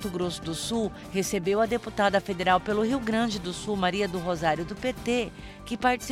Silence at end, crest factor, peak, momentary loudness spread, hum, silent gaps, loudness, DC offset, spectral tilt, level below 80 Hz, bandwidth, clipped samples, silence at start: 0 s; 18 dB; -10 dBFS; 7 LU; none; none; -27 LUFS; under 0.1%; -4.5 dB/octave; -48 dBFS; 16 kHz; under 0.1%; 0 s